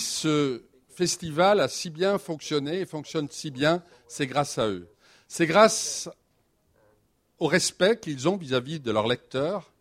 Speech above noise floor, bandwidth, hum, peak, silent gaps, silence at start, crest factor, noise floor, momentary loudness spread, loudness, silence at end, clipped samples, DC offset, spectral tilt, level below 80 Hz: 43 dB; 16 kHz; none; -4 dBFS; none; 0 s; 22 dB; -69 dBFS; 11 LU; -26 LUFS; 0.2 s; under 0.1%; under 0.1%; -4 dB/octave; -64 dBFS